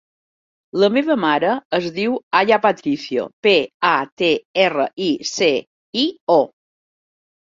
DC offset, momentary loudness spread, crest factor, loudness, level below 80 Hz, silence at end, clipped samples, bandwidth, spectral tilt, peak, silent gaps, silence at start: under 0.1%; 7 LU; 18 dB; -18 LUFS; -64 dBFS; 1.05 s; under 0.1%; 7.6 kHz; -4 dB/octave; -2 dBFS; 1.65-1.70 s, 2.23-2.31 s, 3.33-3.43 s, 3.74-3.80 s, 4.12-4.17 s, 4.45-4.54 s, 5.67-5.93 s, 6.21-6.27 s; 0.75 s